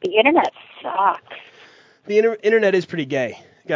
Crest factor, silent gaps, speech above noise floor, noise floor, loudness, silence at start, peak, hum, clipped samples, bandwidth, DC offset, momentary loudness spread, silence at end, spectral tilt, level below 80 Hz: 20 dB; none; 30 dB; -49 dBFS; -19 LUFS; 0 s; 0 dBFS; none; under 0.1%; 7.6 kHz; under 0.1%; 18 LU; 0 s; -5.5 dB/octave; -72 dBFS